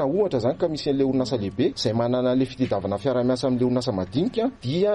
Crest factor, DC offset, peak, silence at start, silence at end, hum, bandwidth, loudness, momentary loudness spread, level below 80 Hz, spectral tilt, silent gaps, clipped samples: 12 dB; under 0.1%; -10 dBFS; 0 s; 0 s; none; 11 kHz; -24 LUFS; 3 LU; -52 dBFS; -7 dB/octave; none; under 0.1%